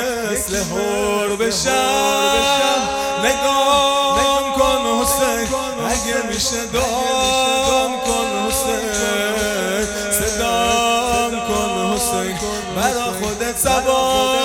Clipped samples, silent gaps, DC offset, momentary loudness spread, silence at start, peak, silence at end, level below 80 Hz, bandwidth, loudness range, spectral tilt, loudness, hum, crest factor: under 0.1%; none; under 0.1%; 5 LU; 0 s; -2 dBFS; 0 s; -38 dBFS; 17.5 kHz; 3 LU; -2 dB/octave; -17 LUFS; none; 16 dB